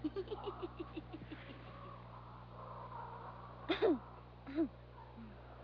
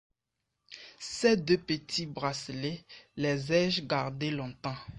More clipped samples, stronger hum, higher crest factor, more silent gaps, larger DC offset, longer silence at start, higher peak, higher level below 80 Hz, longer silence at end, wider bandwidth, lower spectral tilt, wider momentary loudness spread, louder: neither; first, 60 Hz at -55 dBFS vs none; about the same, 22 dB vs 18 dB; neither; neither; second, 0 s vs 0.7 s; second, -22 dBFS vs -14 dBFS; about the same, -60 dBFS vs -64 dBFS; about the same, 0 s vs 0 s; second, 5.4 kHz vs 11 kHz; about the same, -5 dB/octave vs -5 dB/octave; about the same, 18 LU vs 17 LU; second, -44 LUFS vs -31 LUFS